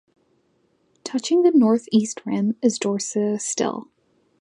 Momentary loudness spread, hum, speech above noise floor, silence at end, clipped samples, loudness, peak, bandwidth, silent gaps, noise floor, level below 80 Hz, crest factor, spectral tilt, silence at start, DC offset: 11 LU; none; 45 dB; 0.6 s; under 0.1%; -21 LUFS; -6 dBFS; 11 kHz; none; -65 dBFS; -72 dBFS; 16 dB; -5 dB/octave; 1.05 s; under 0.1%